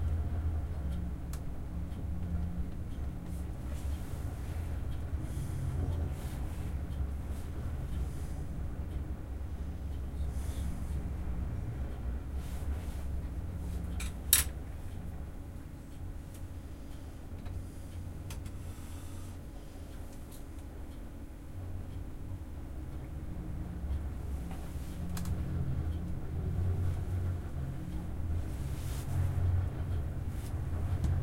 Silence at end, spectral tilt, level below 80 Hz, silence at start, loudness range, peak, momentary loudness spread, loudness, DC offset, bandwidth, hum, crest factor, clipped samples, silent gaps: 0 s; -5 dB/octave; -40 dBFS; 0 s; 11 LU; -4 dBFS; 11 LU; -39 LUFS; under 0.1%; 16.5 kHz; none; 32 dB; under 0.1%; none